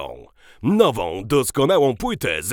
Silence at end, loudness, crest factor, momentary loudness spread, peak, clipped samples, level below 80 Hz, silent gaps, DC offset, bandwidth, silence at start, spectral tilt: 0 s; -19 LUFS; 18 dB; 9 LU; -2 dBFS; under 0.1%; -44 dBFS; none; under 0.1%; over 20 kHz; 0 s; -5 dB/octave